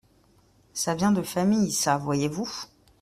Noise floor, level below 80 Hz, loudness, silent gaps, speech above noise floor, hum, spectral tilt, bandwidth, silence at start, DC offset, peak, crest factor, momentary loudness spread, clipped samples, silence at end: -61 dBFS; -60 dBFS; -25 LUFS; none; 36 dB; none; -4.5 dB/octave; 15.5 kHz; 0.75 s; under 0.1%; -8 dBFS; 18 dB; 13 LU; under 0.1%; 0.35 s